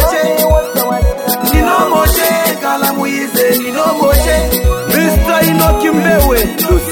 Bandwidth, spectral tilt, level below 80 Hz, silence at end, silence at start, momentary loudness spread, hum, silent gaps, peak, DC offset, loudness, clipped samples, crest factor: 19 kHz; -4.5 dB/octave; -18 dBFS; 0 s; 0 s; 4 LU; none; none; 0 dBFS; under 0.1%; -11 LUFS; under 0.1%; 10 dB